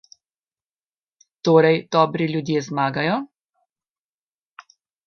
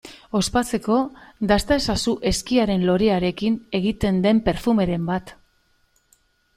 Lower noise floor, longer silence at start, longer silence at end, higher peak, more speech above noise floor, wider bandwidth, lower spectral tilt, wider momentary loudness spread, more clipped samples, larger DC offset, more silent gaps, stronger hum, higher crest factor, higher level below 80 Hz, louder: first, under -90 dBFS vs -63 dBFS; first, 1.45 s vs 0.05 s; first, 1.8 s vs 1.25 s; about the same, -2 dBFS vs -4 dBFS; first, over 71 dB vs 43 dB; second, 6.8 kHz vs 14.5 kHz; about the same, -6.5 dB/octave vs -5.5 dB/octave; first, 10 LU vs 6 LU; neither; neither; neither; neither; about the same, 22 dB vs 18 dB; second, -68 dBFS vs -40 dBFS; about the same, -20 LUFS vs -21 LUFS